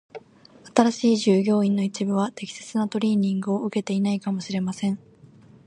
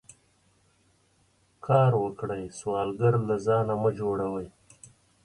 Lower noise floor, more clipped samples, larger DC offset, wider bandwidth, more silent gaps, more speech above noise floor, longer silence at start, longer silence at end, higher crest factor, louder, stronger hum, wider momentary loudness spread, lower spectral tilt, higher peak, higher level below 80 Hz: second, -50 dBFS vs -66 dBFS; neither; neither; about the same, 11 kHz vs 11 kHz; neither; second, 28 dB vs 40 dB; second, 0.15 s vs 1.65 s; about the same, 0.7 s vs 0.75 s; about the same, 22 dB vs 20 dB; first, -23 LUFS vs -27 LUFS; neither; second, 9 LU vs 12 LU; second, -6 dB/octave vs -8 dB/octave; first, -2 dBFS vs -8 dBFS; second, -68 dBFS vs -60 dBFS